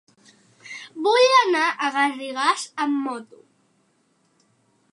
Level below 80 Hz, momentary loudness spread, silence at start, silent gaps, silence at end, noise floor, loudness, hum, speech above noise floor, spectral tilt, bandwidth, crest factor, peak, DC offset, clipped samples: -86 dBFS; 21 LU; 0.65 s; none; 1.7 s; -65 dBFS; -20 LUFS; none; 45 dB; -1 dB/octave; 11.5 kHz; 20 dB; -4 dBFS; under 0.1%; under 0.1%